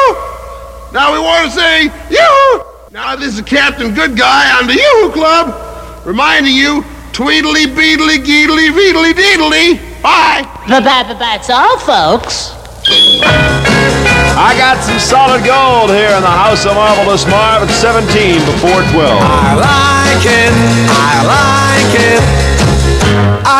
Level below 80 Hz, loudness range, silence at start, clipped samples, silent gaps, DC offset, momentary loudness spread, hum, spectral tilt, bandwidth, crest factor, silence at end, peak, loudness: -24 dBFS; 2 LU; 0 s; under 0.1%; none; under 0.1%; 9 LU; none; -4 dB/octave; 16.5 kHz; 8 dB; 0 s; 0 dBFS; -8 LUFS